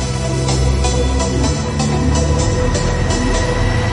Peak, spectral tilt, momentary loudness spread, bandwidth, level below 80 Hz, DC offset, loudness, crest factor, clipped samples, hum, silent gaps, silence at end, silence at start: -4 dBFS; -5 dB/octave; 2 LU; 11.5 kHz; -20 dBFS; under 0.1%; -16 LUFS; 12 dB; under 0.1%; none; none; 0 s; 0 s